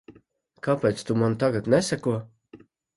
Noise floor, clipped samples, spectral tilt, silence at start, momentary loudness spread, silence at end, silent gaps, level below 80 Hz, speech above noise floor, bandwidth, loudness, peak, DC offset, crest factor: -59 dBFS; under 0.1%; -6 dB/octave; 0.1 s; 7 LU; 0.4 s; none; -60 dBFS; 36 dB; 11.5 kHz; -25 LUFS; -6 dBFS; under 0.1%; 20 dB